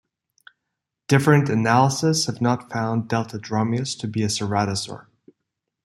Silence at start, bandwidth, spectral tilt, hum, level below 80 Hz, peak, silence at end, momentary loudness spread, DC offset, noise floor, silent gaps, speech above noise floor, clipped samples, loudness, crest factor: 1.1 s; 13.5 kHz; -5 dB/octave; none; -60 dBFS; -2 dBFS; 0.85 s; 9 LU; under 0.1%; -82 dBFS; none; 61 dB; under 0.1%; -21 LUFS; 20 dB